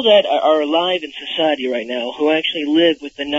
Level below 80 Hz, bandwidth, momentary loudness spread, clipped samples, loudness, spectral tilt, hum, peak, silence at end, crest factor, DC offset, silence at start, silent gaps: -60 dBFS; 7.8 kHz; 9 LU; under 0.1%; -17 LUFS; -4.5 dB/octave; none; 0 dBFS; 0 s; 16 dB; under 0.1%; 0 s; none